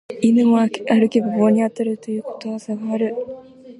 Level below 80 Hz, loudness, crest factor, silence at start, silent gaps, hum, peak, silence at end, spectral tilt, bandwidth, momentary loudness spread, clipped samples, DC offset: -68 dBFS; -19 LUFS; 16 dB; 0.1 s; none; none; -4 dBFS; 0.05 s; -7 dB/octave; 10.5 kHz; 13 LU; under 0.1%; under 0.1%